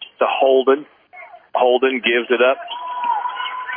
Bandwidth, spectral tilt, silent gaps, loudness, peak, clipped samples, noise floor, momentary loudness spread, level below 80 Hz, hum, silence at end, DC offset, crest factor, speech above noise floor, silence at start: 3.6 kHz; -6.5 dB/octave; none; -18 LUFS; -2 dBFS; under 0.1%; -41 dBFS; 10 LU; -78 dBFS; none; 0 s; under 0.1%; 16 dB; 25 dB; 0 s